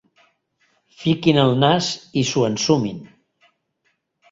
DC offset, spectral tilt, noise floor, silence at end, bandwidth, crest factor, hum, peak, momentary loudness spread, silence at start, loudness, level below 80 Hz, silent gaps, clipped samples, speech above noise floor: under 0.1%; -5 dB/octave; -70 dBFS; 1.25 s; 7.8 kHz; 20 dB; none; -2 dBFS; 10 LU; 1 s; -19 LUFS; -58 dBFS; none; under 0.1%; 51 dB